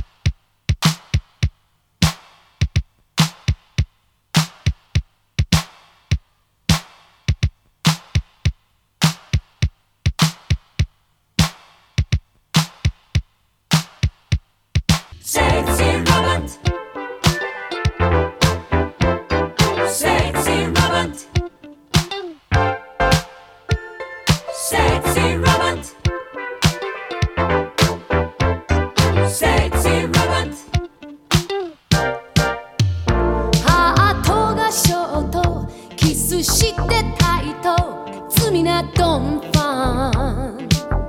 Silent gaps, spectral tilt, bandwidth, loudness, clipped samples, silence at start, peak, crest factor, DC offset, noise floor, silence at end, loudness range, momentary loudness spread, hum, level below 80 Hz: none; -4.5 dB/octave; 18 kHz; -19 LUFS; under 0.1%; 0 s; 0 dBFS; 20 dB; under 0.1%; -60 dBFS; 0 s; 6 LU; 9 LU; none; -28 dBFS